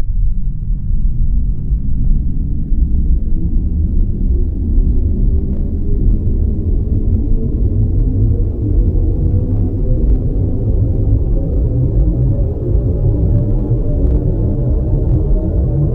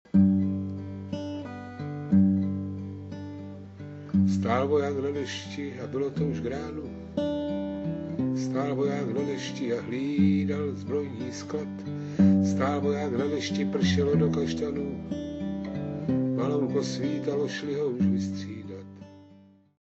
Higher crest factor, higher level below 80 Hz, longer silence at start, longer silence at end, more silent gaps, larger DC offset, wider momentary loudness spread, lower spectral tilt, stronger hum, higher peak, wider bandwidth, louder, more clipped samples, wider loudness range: second, 12 dB vs 18 dB; first, -14 dBFS vs -56 dBFS; second, 0 s vs 0.15 s; second, 0 s vs 0.45 s; neither; neither; second, 5 LU vs 14 LU; first, -13.5 dB/octave vs -7 dB/octave; neither; first, -2 dBFS vs -10 dBFS; second, 1.4 kHz vs 7.8 kHz; first, -17 LUFS vs -28 LUFS; neither; about the same, 3 LU vs 4 LU